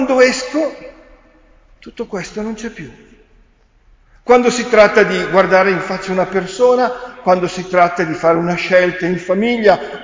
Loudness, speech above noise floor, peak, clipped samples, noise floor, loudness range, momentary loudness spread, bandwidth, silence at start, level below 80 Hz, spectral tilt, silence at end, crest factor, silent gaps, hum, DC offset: -14 LUFS; 37 dB; 0 dBFS; under 0.1%; -51 dBFS; 14 LU; 14 LU; 7.6 kHz; 0 s; -48 dBFS; -5 dB/octave; 0 s; 16 dB; none; none; under 0.1%